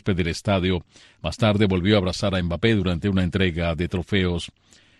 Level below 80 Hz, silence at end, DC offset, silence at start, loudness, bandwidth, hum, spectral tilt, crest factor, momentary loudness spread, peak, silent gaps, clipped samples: -40 dBFS; 0.5 s; under 0.1%; 0.05 s; -23 LUFS; 11.5 kHz; none; -6.5 dB/octave; 18 dB; 8 LU; -4 dBFS; none; under 0.1%